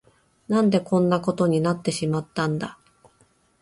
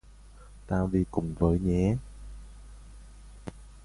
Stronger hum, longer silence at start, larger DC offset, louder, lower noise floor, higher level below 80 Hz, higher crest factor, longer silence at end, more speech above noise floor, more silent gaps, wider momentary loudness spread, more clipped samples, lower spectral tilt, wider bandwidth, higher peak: neither; first, 0.5 s vs 0.1 s; neither; first, -23 LUFS vs -28 LUFS; first, -62 dBFS vs -51 dBFS; second, -60 dBFS vs -42 dBFS; about the same, 18 dB vs 20 dB; first, 0.9 s vs 0 s; first, 40 dB vs 24 dB; neither; second, 6 LU vs 24 LU; neither; second, -6.5 dB/octave vs -9 dB/octave; about the same, 11.5 kHz vs 11.5 kHz; first, -6 dBFS vs -10 dBFS